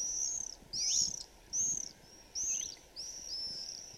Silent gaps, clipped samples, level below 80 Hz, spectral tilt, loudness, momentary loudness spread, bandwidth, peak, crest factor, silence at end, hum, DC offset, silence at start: none; under 0.1%; -64 dBFS; 1 dB/octave; -35 LUFS; 13 LU; 16.5 kHz; -20 dBFS; 20 dB; 0 s; none; under 0.1%; 0 s